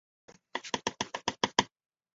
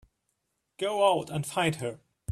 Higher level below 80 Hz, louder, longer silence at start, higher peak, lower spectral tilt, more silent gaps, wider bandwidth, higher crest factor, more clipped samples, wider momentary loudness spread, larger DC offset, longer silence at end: about the same, -66 dBFS vs -66 dBFS; second, -33 LUFS vs -28 LUFS; second, 0.55 s vs 0.8 s; first, -4 dBFS vs -10 dBFS; second, -1 dB/octave vs -4.5 dB/octave; neither; second, 8 kHz vs 14 kHz; first, 32 dB vs 20 dB; neither; about the same, 12 LU vs 12 LU; neither; first, 0.5 s vs 0 s